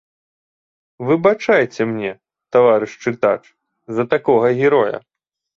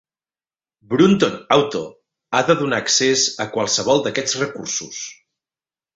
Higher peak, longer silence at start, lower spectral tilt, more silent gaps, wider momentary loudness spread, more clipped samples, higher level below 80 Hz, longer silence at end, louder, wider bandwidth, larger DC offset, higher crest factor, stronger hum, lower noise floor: about the same, -2 dBFS vs -2 dBFS; about the same, 1 s vs 0.9 s; first, -7 dB/octave vs -3 dB/octave; neither; about the same, 11 LU vs 12 LU; neither; about the same, -62 dBFS vs -60 dBFS; second, 0.55 s vs 0.85 s; about the same, -17 LUFS vs -18 LUFS; second, 7.4 kHz vs 8.2 kHz; neither; about the same, 16 dB vs 18 dB; neither; about the same, under -90 dBFS vs under -90 dBFS